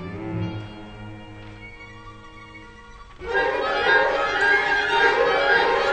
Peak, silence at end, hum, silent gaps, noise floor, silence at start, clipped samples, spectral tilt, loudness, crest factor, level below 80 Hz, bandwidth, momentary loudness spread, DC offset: -6 dBFS; 0 s; none; none; -43 dBFS; 0 s; under 0.1%; -4.5 dB/octave; -20 LUFS; 16 dB; -46 dBFS; 9.2 kHz; 23 LU; under 0.1%